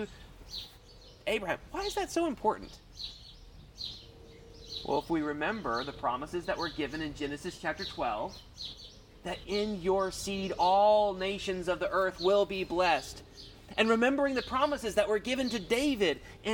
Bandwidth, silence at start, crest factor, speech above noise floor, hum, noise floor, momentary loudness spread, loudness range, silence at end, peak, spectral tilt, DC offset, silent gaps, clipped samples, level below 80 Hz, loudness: 19 kHz; 0 s; 20 dB; 23 dB; none; -54 dBFS; 15 LU; 8 LU; 0 s; -12 dBFS; -4 dB/octave; under 0.1%; none; under 0.1%; -54 dBFS; -31 LUFS